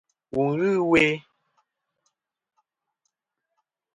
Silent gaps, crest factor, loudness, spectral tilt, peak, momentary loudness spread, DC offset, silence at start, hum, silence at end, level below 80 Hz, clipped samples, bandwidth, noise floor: none; 22 dB; -22 LUFS; -6 dB/octave; -6 dBFS; 12 LU; under 0.1%; 0.35 s; none; 2.75 s; -60 dBFS; under 0.1%; 11 kHz; -83 dBFS